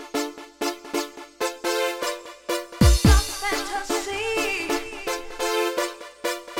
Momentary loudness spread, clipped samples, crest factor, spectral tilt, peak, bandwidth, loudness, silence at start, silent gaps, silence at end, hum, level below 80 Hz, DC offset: 11 LU; under 0.1%; 20 dB; -4.5 dB/octave; -4 dBFS; 17 kHz; -25 LUFS; 0 s; none; 0 s; none; -28 dBFS; under 0.1%